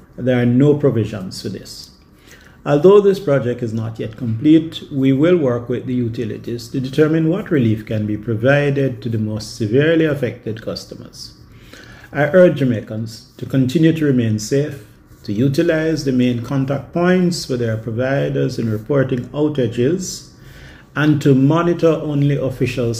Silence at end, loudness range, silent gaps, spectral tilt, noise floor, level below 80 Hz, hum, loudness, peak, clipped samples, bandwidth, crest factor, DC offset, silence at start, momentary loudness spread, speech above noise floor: 0 s; 3 LU; none; -7 dB/octave; -45 dBFS; -48 dBFS; none; -17 LUFS; 0 dBFS; under 0.1%; 15.5 kHz; 16 dB; under 0.1%; 0.15 s; 14 LU; 28 dB